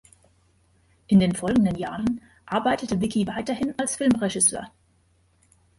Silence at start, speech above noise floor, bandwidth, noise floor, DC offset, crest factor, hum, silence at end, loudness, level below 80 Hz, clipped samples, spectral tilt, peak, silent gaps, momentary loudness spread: 1.1 s; 40 dB; 11.5 kHz; -63 dBFS; under 0.1%; 18 dB; none; 1.1 s; -23 LUFS; -52 dBFS; under 0.1%; -4.5 dB/octave; -8 dBFS; none; 9 LU